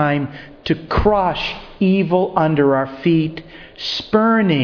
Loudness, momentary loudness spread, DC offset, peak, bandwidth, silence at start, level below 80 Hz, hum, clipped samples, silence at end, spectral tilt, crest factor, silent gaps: -17 LUFS; 10 LU; under 0.1%; -2 dBFS; 5.4 kHz; 0 s; -36 dBFS; none; under 0.1%; 0 s; -7.5 dB/octave; 16 dB; none